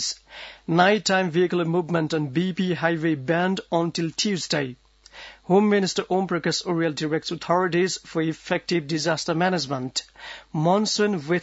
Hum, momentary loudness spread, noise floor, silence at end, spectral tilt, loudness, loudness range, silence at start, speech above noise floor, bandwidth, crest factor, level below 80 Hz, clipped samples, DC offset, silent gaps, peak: none; 9 LU; -45 dBFS; 0 s; -4.5 dB/octave; -23 LUFS; 2 LU; 0 s; 22 dB; 8 kHz; 18 dB; -62 dBFS; under 0.1%; under 0.1%; none; -6 dBFS